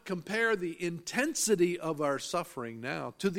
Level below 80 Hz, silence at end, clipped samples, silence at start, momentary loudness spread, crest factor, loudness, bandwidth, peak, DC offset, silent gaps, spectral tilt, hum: -70 dBFS; 0 s; under 0.1%; 0.05 s; 9 LU; 18 dB; -32 LUFS; 16.5 kHz; -14 dBFS; under 0.1%; none; -4 dB/octave; none